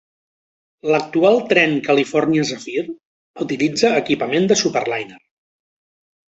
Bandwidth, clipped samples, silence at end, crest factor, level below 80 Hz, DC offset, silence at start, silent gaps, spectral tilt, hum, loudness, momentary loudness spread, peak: 8.2 kHz; under 0.1%; 1.15 s; 18 dB; -62 dBFS; under 0.1%; 0.85 s; 3.05-3.34 s; -4.5 dB/octave; none; -17 LUFS; 12 LU; -2 dBFS